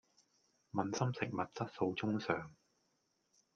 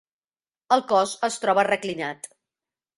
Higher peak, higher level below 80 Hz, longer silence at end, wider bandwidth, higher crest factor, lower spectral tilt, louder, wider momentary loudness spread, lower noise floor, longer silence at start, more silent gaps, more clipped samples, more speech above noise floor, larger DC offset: second, -18 dBFS vs -6 dBFS; second, -78 dBFS vs -72 dBFS; first, 1.05 s vs 0.7 s; second, 7.2 kHz vs 11.5 kHz; about the same, 24 dB vs 20 dB; first, -6 dB/octave vs -3 dB/octave; second, -39 LUFS vs -23 LUFS; second, 5 LU vs 13 LU; second, -80 dBFS vs under -90 dBFS; about the same, 0.75 s vs 0.7 s; neither; neither; second, 42 dB vs over 67 dB; neither